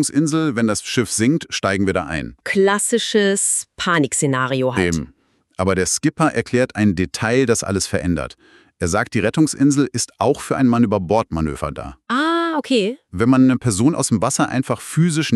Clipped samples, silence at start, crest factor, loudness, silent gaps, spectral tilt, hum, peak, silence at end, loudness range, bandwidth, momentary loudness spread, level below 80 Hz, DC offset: under 0.1%; 0 s; 14 dB; -18 LUFS; none; -4.5 dB/octave; none; -4 dBFS; 0 s; 1 LU; 13.5 kHz; 7 LU; -44 dBFS; under 0.1%